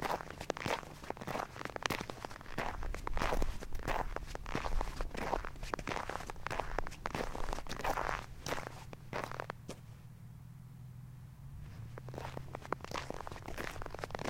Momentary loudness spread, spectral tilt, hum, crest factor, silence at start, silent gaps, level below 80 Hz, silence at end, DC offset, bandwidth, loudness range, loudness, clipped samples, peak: 14 LU; -4.5 dB/octave; none; 30 dB; 0 s; none; -44 dBFS; 0 s; under 0.1%; 17 kHz; 8 LU; -42 LUFS; under 0.1%; -10 dBFS